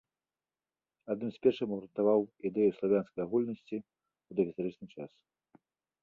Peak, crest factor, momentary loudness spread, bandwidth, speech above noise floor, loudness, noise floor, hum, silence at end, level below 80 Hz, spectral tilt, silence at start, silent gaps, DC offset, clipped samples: -14 dBFS; 20 dB; 17 LU; 4.6 kHz; over 58 dB; -33 LUFS; under -90 dBFS; none; 0.95 s; -74 dBFS; -9 dB/octave; 1.05 s; none; under 0.1%; under 0.1%